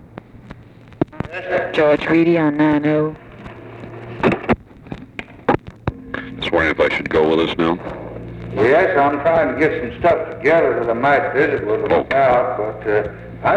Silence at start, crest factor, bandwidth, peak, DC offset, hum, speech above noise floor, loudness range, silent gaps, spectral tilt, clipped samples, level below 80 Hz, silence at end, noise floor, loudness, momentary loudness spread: 0.15 s; 16 dB; 8.8 kHz; -2 dBFS; under 0.1%; none; 24 dB; 5 LU; none; -7.5 dB/octave; under 0.1%; -42 dBFS; 0 s; -40 dBFS; -17 LUFS; 17 LU